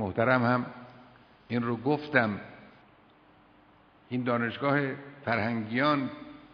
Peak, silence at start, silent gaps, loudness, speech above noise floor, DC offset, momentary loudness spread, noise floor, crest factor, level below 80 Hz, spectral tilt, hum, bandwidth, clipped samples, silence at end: -8 dBFS; 0 s; none; -29 LUFS; 31 dB; under 0.1%; 14 LU; -59 dBFS; 22 dB; -68 dBFS; -9 dB/octave; none; 5.4 kHz; under 0.1%; 0.05 s